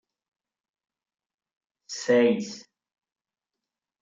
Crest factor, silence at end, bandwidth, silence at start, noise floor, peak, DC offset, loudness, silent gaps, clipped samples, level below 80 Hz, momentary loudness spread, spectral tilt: 20 dB; 1.4 s; 7.8 kHz; 1.9 s; -88 dBFS; -10 dBFS; under 0.1%; -24 LUFS; none; under 0.1%; -80 dBFS; 18 LU; -4.5 dB/octave